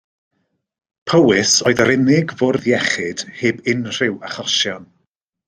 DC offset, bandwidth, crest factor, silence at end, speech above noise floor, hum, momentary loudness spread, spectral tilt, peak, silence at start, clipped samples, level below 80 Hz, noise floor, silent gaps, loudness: under 0.1%; 14 kHz; 18 dB; 0.65 s; 54 dB; none; 9 LU; -3.5 dB/octave; 0 dBFS; 1.05 s; under 0.1%; -56 dBFS; -70 dBFS; none; -16 LUFS